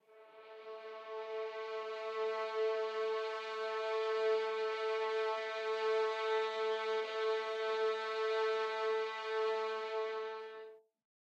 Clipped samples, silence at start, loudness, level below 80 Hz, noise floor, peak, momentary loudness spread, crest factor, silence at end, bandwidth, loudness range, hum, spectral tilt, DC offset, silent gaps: under 0.1%; 0.1 s; -37 LUFS; under -90 dBFS; -58 dBFS; -24 dBFS; 12 LU; 14 dB; 0.4 s; 8.4 kHz; 3 LU; none; -0.5 dB/octave; under 0.1%; none